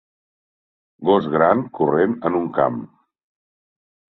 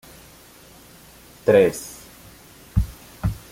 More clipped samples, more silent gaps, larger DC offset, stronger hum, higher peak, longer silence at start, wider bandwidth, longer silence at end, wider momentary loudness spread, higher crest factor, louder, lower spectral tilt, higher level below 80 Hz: neither; neither; neither; neither; about the same, -2 dBFS vs -4 dBFS; second, 1 s vs 1.45 s; second, 4.3 kHz vs 17 kHz; first, 1.3 s vs 0.15 s; second, 5 LU vs 27 LU; about the same, 20 dB vs 20 dB; first, -19 LUFS vs -22 LUFS; first, -10 dB/octave vs -6 dB/octave; second, -60 dBFS vs -36 dBFS